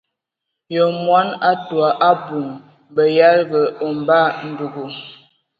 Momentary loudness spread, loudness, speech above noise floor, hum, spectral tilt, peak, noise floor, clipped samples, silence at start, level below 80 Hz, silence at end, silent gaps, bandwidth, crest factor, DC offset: 15 LU; -17 LUFS; 64 dB; none; -8 dB/octave; 0 dBFS; -80 dBFS; under 0.1%; 0.7 s; -68 dBFS; 0.45 s; none; 5.2 kHz; 18 dB; under 0.1%